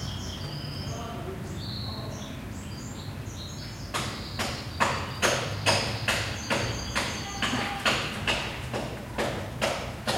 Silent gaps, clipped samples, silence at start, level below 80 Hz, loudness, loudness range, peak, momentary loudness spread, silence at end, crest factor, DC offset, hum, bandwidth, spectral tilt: none; under 0.1%; 0 s; -46 dBFS; -30 LUFS; 9 LU; -8 dBFS; 12 LU; 0 s; 22 dB; under 0.1%; none; 16 kHz; -3.5 dB/octave